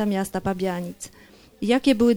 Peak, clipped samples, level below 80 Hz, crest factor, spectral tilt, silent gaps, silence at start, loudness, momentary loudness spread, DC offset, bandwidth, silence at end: -8 dBFS; under 0.1%; -52 dBFS; 16 dB; -5.5 dB/octave; none; 0 s; -24 LUFS; 17 LU; under 0.1%; over 20 kHz; 0 s